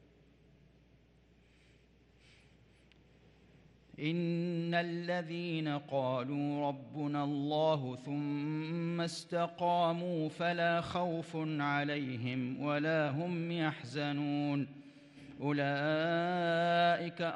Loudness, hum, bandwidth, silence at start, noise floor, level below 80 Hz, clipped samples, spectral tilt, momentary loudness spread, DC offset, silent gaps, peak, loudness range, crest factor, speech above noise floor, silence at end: -35 LUFS; none; 11 kHz; 4 s; -65 dBFS; -74 dBFS; under 0.1%; -6.5 dB/octave; 7 LU; under 0.1%; none; -20 dBFS; 4 LU; 16 dB; 31 dB; 0 s